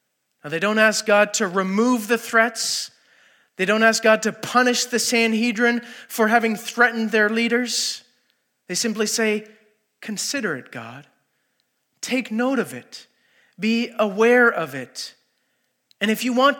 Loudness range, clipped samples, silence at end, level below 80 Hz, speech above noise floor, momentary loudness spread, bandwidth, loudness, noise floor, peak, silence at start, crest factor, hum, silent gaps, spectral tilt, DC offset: 8 LU; under 0.1%; 0 s; -86 dBFS; 51 dB; 16 LU; 17.5 kHz; -20 LUFS; -71 dBFS; -2 dBFS; 0.45 s; 20 dB; none; none; -3 dB/octave; under 0.1%